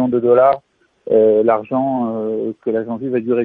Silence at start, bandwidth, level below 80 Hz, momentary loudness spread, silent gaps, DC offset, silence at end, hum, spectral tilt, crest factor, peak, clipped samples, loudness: 0 s; 4.2 kHz; -62 dBFS; 10 LU; none; under 0.1%; 0 s; none; -10.5 dB/octave; 14 dB; -2 dBFS; under 0.1%; -16 LUFS